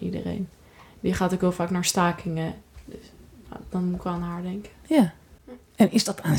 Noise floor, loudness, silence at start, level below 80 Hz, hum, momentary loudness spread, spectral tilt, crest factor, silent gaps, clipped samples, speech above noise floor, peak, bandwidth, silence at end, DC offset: -49 dBFS; -25 LUFS; 0 s; -50 dBFS; none; 22 LU; -5.5 dB/octave; 20 dB; none; under 0.1%; 24 dB; -6 dBFS; 18.5 kHz; 0 s; under 0.1%